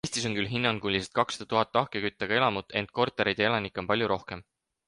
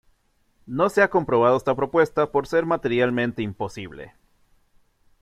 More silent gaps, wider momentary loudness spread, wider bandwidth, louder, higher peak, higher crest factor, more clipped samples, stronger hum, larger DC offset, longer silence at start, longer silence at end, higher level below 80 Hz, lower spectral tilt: neither; second, 6 LU vs 13 LU; second, 11.5 kHz vs 13 kHz; second, -28 LUFS vs -22 LUFS; second, -8 dBFS vs -4 dBFS; about the same, 20 dB vs 18 dB; neither; neither; neither; second, 0.05 s vs 0.7 s; second, 0.45 s vs 1.15 s; about the same, -58 dBFS vs -56 dBFS; second, -4 dB/octave vs -6.5 dB/octave